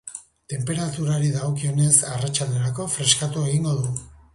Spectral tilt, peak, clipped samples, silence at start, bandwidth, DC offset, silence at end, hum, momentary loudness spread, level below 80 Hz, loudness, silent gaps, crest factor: -4 dB/octave; -2 dBFS; under 0.1%; 0.05 s; 11.5 kHz; under 0.1%; 0.25 s; none; 13 LU; -52 dBFS; -22 LUFS; none; 20 dB